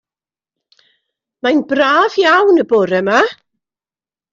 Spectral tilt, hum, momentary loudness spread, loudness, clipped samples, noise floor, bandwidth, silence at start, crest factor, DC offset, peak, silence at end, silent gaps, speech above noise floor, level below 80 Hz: -5 dB/octave; none; 5 LU; -13 LUFS; under 0.1%; under -90 dBFS; 7.6 kHz; 1.45 s; 14 dB; under 0.1%; -2 dBFS; 1 s; none; over 78 dB; -62 dBFS